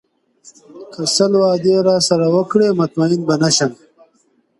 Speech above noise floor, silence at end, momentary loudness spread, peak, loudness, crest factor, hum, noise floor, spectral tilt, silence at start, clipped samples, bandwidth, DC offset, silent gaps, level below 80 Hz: 45 dB; 0.85 s; 4 LU; 0 dBFS; -15 LUFS; 16 dB; none; -60 dBFS; -4.5 dB/octave; 0.75 s; under 0.1%; 11.5 kHz; under 0.1%; none; -62 dBFS